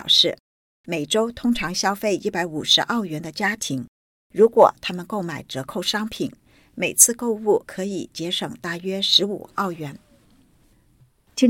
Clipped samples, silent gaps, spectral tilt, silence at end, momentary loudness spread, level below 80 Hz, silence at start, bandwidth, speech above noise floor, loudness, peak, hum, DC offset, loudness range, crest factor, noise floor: under 0.1%; 0.40-0.84 s, 3.88-4.30 s; -2.5 dB/octave; 0 s; 15 LU; -56 dBFS; 0 s; 17 kHz; 36 dB; -21 LUFS; 0 dBFS; none; under 0.1%; 4 LU; 22 dB; -58 dBFS